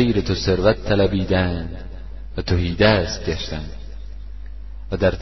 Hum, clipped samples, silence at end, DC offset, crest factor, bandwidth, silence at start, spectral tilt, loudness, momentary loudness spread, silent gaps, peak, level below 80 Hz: 50 Hz at -35 dBFS; under 0.1%; 0 s; 1%; 20 dB; 6.2 kHz; 0 s; -6 dB/octave; -20 LUFS; 21 LU; none; -2 dBFS; -32 dBFS